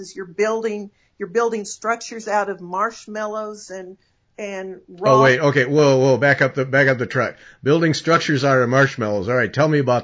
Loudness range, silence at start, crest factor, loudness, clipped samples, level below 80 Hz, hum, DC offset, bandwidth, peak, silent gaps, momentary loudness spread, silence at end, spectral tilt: 9 LU; 0 s; 18 dB; -18 LUFS; under 0.1%; -58 dBFS; none; under 0.1%; 8 kHz; -2 dBFS; none; 16 LU; 0 s; -5.5 dB/octave